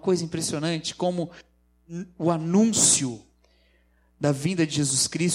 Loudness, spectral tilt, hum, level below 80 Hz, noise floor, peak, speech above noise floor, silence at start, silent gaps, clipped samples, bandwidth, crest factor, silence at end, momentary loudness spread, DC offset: -23 LUFS; -4 dB/octave; 60 Hz at -50 dBFS; -62 dBFS; -63 dBFS; -6 dBFS; 38 dB; 0.05 s; none; under 0.1%; 16.5 kHz; 20 dB; 0 s; 19 LU; under 0.1%